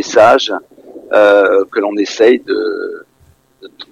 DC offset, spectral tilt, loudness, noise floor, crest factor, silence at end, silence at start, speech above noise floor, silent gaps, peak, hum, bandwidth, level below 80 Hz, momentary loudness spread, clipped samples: under 0.1%; -3.5 dB/octave; -11 LUFS; -51 dBFS; 12 dB; 0.1 s; 0 s; 39 dB; none; 0 dBFS; none; 10 kHz; -54 dBFS; 15 LU; under 0.1%